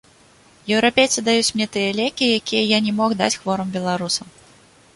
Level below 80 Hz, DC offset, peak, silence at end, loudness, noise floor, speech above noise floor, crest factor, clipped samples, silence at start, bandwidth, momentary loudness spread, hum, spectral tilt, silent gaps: -58 dBFS; under 0.1%; -2 dBFS; 0.65 s; -19 LUFS; -51 dBFS; 32 dB; 18 dB; under 0.1%; 0.65 s; 11.5 kHz; 7 LU; none; -3 dB/octave; none